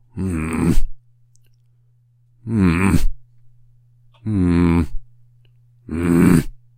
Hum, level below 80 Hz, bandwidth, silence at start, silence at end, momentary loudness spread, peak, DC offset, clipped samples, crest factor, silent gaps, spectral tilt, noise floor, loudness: none; -28 dBFS; 16 kHz; 0.15 s; 0.2 s; 16 LU; 0 dBFS; under 0.1%; under 0.1%; 18 dB; none; -7.5 dB/octave; -56 dBFS; -19 LUFS